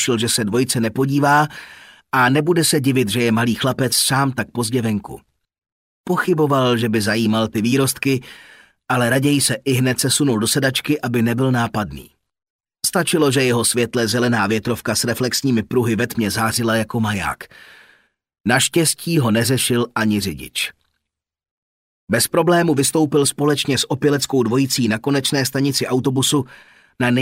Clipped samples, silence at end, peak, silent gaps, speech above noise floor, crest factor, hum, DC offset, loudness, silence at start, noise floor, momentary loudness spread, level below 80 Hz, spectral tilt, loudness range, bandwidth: under 0.1%; 0 s; -2 dBFS; 5.72-6.04 s, 12.50-12.59 s, 21.51-22.07 s; 59 dB; 16 dB; none; under 0.1%; -18 LUFS; 0 s; -77 dBFS; 7 LU; -52 dBFS; -4 dB/octave; 3 LU; 16 kHz